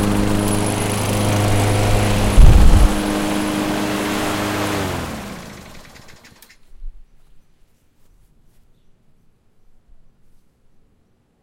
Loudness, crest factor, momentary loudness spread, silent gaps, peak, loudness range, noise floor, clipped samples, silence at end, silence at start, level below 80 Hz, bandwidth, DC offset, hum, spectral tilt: -18 LUFS; 18 dB; 18 LU; none; 0 dBFS; 14 LU; -59 dBFS; under 0.1%; 4.45 s; 0 s; -20 dBFS; 16.5 kHz; under 0.1%; none; -5.5 dB/octave